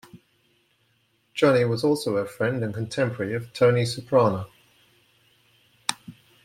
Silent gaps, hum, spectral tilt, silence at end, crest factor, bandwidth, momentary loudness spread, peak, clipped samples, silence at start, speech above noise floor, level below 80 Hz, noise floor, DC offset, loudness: none; none; -5.5 dB/octave; 0.35 s; 22 dB; 16 kHz; 10 LU; -2 dBFS; under 0.1%; 0.15 s; 45 dB; -64 dBFS; -67 dBFS; under 0.1%; -24 LUFS